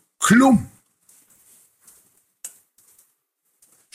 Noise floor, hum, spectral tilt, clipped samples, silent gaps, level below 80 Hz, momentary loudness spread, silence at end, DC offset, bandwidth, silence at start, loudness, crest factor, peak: -72 dBFS; none; -4.5 dB/octave; under 0.1%; none; -56 dBFS; 25 LU; 1.45 s; under 0.1%; 16 kHz; 0.2 s; -16 LUFS; 20 dB; -4 dBFS